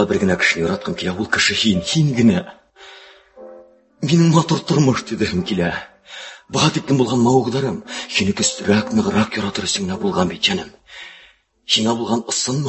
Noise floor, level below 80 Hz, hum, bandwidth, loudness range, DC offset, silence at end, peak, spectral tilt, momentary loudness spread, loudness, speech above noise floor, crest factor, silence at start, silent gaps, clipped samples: -51 dBFS; -46 dBFS; none; 8.6 kHz; 2 LU; under 0.1%; 0 s; -2 dBFS; -4.5 dB/octave; 15 LU; -18 LUFS; 33 dB; 18 dB; 0 s; none; under 0.1%